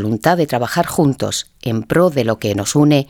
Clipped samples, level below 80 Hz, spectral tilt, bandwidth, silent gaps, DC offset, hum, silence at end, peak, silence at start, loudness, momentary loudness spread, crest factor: under 0.1%; -48 dBFS; -5.5 dB/octave; 18.5 kHz; none; under 0.1%; none; 0.05 s; 0 dBFS; 0 s; -16 LUFS; 7 LU; 16 dB